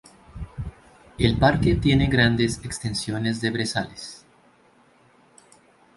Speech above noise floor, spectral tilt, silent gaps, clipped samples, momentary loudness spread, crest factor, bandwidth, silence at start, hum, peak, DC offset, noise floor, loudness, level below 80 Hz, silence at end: 36 dB; -5.5 dB/octave; none; under 0.1%; 19 LU; 20 dB; 11.5 kHz; 0.35 s; none; -4 dBFS; under 0.1%; -58 dBFS; -22 LUFS; -38 dBFS; 1.8 s